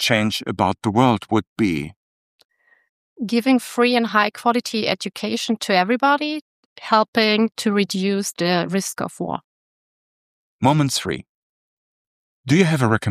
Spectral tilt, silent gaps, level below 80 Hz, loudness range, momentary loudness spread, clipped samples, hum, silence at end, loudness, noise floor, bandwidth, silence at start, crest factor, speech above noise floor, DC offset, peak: -5 dB/octave; 1.47-1.56 s, 1.96-2.39 s, 2.45-2.49 s, 2.89-3.16 s, 6.41-6.76 s, 7.08-7.13 s, 9.44-10.59 s, 11.29-12.44 s; -58 dBFS; 4 LU; 11 LU; under 0.1%; none; 0 s; -20 LUFS; under -90 dBFS; 15 kHz; 0 s; 20 dB; over 71 dB; under 0.1%; -2 dBFS